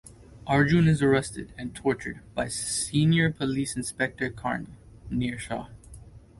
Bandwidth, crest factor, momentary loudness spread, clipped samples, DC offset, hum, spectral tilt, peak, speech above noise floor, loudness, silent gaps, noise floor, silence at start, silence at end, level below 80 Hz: 11.5 kHz; 18 dB; 15 LU; under 0.1%; under 0.1%; none; -5.5 dB/octave; -10 dBFS; 21 dB; -26 LUFS; none; -47 dBFS; 0.05 s; 0.2 s; -50 dBFS